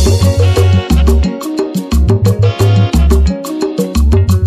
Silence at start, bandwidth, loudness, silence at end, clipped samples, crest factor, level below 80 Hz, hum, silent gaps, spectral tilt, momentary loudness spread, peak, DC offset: 0 s; 15.5 kHz; -12 LUFS; 0 s; under 0.1%; 10 dB; -14 dBFS; none; none; -7 dB/octave; 7 LU; 0 dBFS; under 0.1%